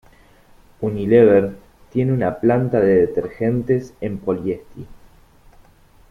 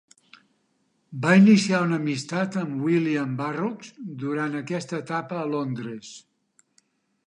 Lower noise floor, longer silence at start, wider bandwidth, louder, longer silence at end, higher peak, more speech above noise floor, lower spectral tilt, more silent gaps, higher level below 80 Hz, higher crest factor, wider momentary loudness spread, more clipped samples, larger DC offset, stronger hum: second, -50 dBFS vs -70 dBFS; second, 0.8 s vs 1.1 s; second, 6.6 kHz vs 10.5 kHz; first, -18 LUFS vs -24 LUFS; about the same, 1.15 s vs 1.05 s; first, -2 dBFS vs -6 dBFS; second, 33 dB vs 46 dB; first, -9.5 dB/octave vs -6 dB/octave; neither; first, -48 dBFS vs -74 dBFS; about the same, 18 dB vs 20 dB; second, 14 LU vs 19 LU; neither; neither; neither